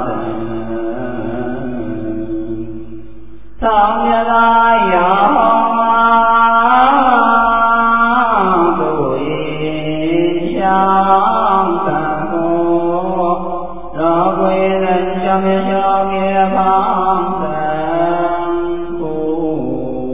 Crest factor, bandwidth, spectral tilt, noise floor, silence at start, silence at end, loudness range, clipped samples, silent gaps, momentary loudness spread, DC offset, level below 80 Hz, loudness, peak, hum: 14 dB; 3.8 kHz; -10 dB/octave; -37 dBFS; 0 s; 0 s; 7 LU; under 0.1%; none; 12 LU; 5%; -40 dBFS; -14 LUFS; 0 dBFS; none